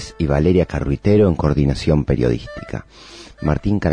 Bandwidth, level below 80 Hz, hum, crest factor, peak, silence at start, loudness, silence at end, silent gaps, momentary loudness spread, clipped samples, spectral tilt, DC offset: 10 kHz; -30 dBFS; none; 14 dB; -4 dBFS; 0 s; -18 LUFS; 0 s; none; 16 LU; under 0.1%; -8 dB/octave; under 0.1%